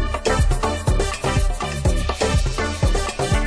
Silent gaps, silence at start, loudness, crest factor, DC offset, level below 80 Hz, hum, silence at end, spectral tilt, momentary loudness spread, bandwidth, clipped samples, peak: none; 0 s; -21 LUFS; 14 dB; under 0.1%; -22 dBFS; none; 0 s; -5 dB/octave; 3 LU; 11 kHz; under 0.1%; -6 dBFS